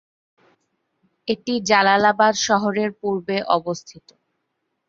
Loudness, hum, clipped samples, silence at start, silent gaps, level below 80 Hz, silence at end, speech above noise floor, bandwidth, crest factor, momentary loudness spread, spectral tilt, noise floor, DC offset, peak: -19 LUFS; none; under 0.1%; 1.25 s; none; -64 dBFS; 1 s; 56 dB; 7.8 kHz; 20 dB; 12 LU; -3.5 dB/octave; -75 dBFS; under 0.1%; -2 dBFS